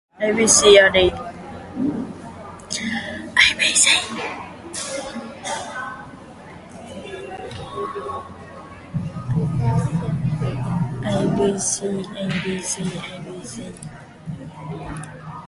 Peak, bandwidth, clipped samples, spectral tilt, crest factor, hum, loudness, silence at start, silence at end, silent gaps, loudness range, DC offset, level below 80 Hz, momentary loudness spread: 0 dBFS; 11.5 kHz; under 0.1%; -3 dB/octave; 22 dB; none; -19 LUFS; 0.2 s; 0 s; none; 14 LU; under 0.1%; -46 dBFS; 23 LU